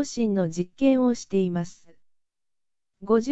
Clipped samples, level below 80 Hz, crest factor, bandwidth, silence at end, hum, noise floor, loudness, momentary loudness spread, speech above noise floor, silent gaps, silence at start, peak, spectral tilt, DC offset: under 0.1%; -58 dBFS; 16 dB; 8.2 kHz; 0 s; none; -87 dBFS; -24 LUFS; 11 LU; 64 dB; none; 0 s; -8 dBFS; -6.5 dB/octave; under 0.1%